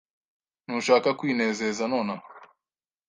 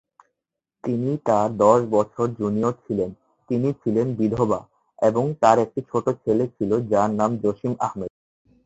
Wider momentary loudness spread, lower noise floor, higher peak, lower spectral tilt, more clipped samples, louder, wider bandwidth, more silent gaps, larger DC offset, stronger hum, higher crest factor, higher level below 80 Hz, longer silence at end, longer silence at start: about the same, 11 LU vs 9 LU; first, under -90 dBFS vs -84 dBFS; second, -6 dBFS vs -2 dBFS; second, -4.5 dB/octave vs -8 dB/octave; neither; second, -25 LUFS vs -22 LUFS; first, 10 kHz vs 8 kHz; neither; neither; neither; about the same, 22 dB vs 20 dB; second, -72 dBFS vs -56 dBFS; about the same, 0.65 s vs 0.55 s; second, 0.7 s vs 0.85 s